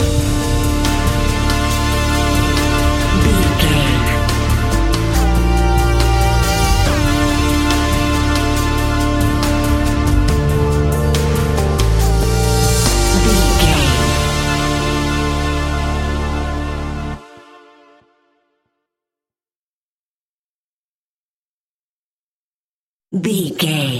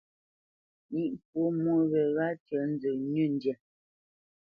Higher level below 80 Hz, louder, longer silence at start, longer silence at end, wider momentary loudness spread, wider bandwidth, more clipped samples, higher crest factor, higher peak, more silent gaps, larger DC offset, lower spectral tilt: first, -20 dBFS vs -76 dBFS; first, -15 LUFS vs -30 LUFS; second, 0 s vs 0.9 s; second, 0 s vs 1.05 s; about the same, 6 LU vs 8 LU; first, 17 kHz vs 5.2 kHz; neither; about the same, 16 dB vs 14 dB; first, 0 dBFS vs -18 dBFS; first, 19.56-23.00 s vs 1.25-1.33 s, 2.40-2.46 s; neither; second, -5 dB/octave vs -10.5 dB/octave